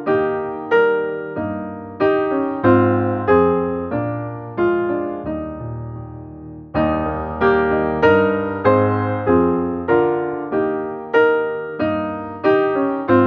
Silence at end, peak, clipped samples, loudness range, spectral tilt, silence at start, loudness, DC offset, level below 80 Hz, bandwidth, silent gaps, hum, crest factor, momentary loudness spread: 0 s; -2 dBFS; under 0.1%; 5 LU; -9.5 dB/octave; 0 s; -18 LUFS; under 0.1%; -46 dBFS; 5.6 kHz; none; none; 16 dB; 12 LU